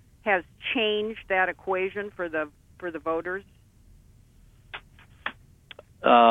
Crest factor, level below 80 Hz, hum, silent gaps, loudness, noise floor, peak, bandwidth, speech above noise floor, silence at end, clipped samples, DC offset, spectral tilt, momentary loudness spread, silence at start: 22 dB; -58 dBFS; none; none; -27 LUFS; -55 dBFS; -4 dBFS; 8.6 kHz; 30 dB; 0 s; under 0.1%; under 0.1%; -5.5 dB/octave; 18 LU; 0.25 s